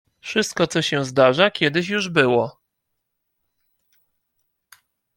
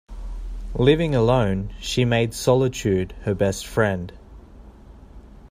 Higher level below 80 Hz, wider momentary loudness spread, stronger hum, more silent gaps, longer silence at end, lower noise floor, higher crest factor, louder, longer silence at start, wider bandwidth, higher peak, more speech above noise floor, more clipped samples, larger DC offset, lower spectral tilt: second, -64 dBFS vs -36 dBFS; second, 7 LU vs 17 LU; neither; neither; first, 2.65 s vs 0.05 s; first, -77 dBFS vs -44 dBFS; about the same, 20 dB vs 20 dB; about the same, -19 LUFS vs -21 LUFS; first, 0.25 s vs 0.1 s; about the same, 17 kHz vs 15.5 kHz; about the same, -2 dBFS vs -2 dBFS; first, 58 dB vs 24 dB; neither; neither; second, -4.5 dB/octave vs -6 dB/octave